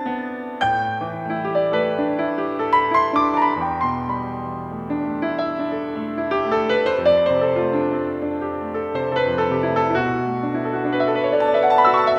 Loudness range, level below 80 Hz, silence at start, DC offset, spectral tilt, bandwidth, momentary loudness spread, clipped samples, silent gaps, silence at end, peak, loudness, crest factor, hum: 3 LU; -54 dBFS; 0 s; under 0.1%; -7.5 dB/octave; 8 kHz; 9 LU; under 0.1%; none; 0 s; -4 dBFS; -21 LUFS; 16 dB; none